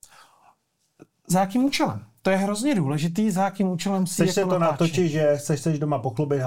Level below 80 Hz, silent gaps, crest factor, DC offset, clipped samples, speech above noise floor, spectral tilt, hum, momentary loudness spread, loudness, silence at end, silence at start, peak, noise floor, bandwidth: -60 dBFS; none; 16 dB; 0.4%; under 0.1%; 43 dB; -6 dB/octave; none; 4 LU; -23 LUFS; 0 s; 0.2 s; -8 dBFS; -66 dBFS; 17 kHz